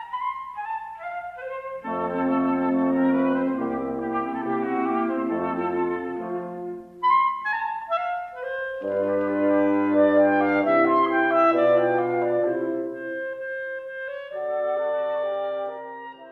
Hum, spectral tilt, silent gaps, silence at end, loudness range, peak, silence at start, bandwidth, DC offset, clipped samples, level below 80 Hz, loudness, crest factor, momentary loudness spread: 60 Hz at -65 dBFS; -8 dB/octave; none; 0 s; 7 LU; -8 dBFS; 0 s; 5.2 kHz; under 0.1%; under 0.1%; -64 dBFS; -24 LUFS; 16 dB; 14 LU